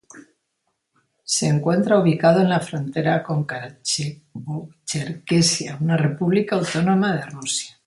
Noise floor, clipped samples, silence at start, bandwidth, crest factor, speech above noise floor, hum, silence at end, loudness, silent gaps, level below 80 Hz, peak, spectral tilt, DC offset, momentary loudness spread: -74 dBFS; under 0.1%; 0.15 s; 11.5 kHz; 18 dB; 54 dB; none; 0.15 s; -21 LUFS; none; -62 dBFS; -2 dBFS; -5 dB/octave; under 0.1%; 13 LU